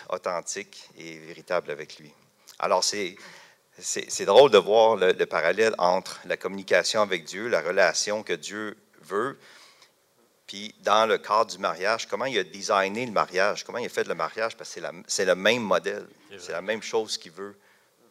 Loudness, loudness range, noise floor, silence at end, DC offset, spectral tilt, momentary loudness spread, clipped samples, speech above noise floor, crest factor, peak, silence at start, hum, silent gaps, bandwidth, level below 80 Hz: -25 LUFS; 8 LU; -64 dBFS; 0.6 s; under 0.1%; -2.5 dB/octave; 17 LU; under 0.1%; 39 dB; 20 dB; -6 dBFS; 0 s; none; none; 15.5 kHz; -78 dBFS